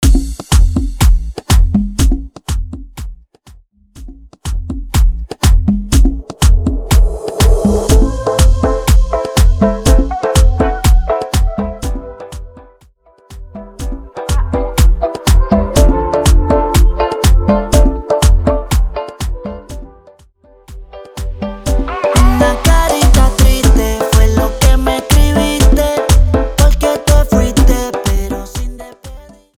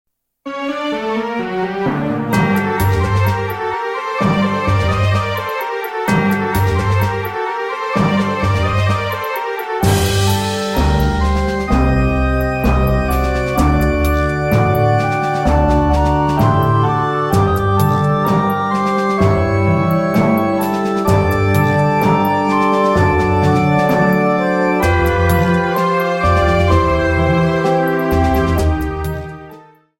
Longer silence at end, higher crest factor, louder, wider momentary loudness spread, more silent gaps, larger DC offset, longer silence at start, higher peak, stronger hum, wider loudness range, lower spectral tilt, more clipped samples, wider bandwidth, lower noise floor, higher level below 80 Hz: about the same, 0.4 s vs 0.4 s; about the same, 12 dB vs 14 dB; about the same, -13 LUFS vs -15 LUFS; first, 15 LU vs 7 LU; neither; neither; second, 0 s vs 0.45 s; about the same, 0 dBFS vs 0 dBFS; neither; first, 9 LU vs 3 LU; about the same, -5.5 dB/octave vs -6.5 dB/octave; neither; about the same, 16.5 kHz vs 16.5 kHz; first, -47 dBFS vs -41 dBFS; first, -14 dBFS vs -24 dBFS